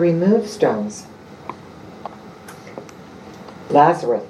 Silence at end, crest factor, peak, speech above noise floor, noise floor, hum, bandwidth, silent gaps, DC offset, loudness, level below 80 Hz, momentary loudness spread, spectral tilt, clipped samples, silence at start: 0 s; 20 dB; 0 dBFS; 22 dB; -39 dBFS; none; 13.5 kHz; none; under 0.1%; -17 LUFS; -62 dBFS; 24 LU; -6.5 dB/octave; under 0.1%; 0 s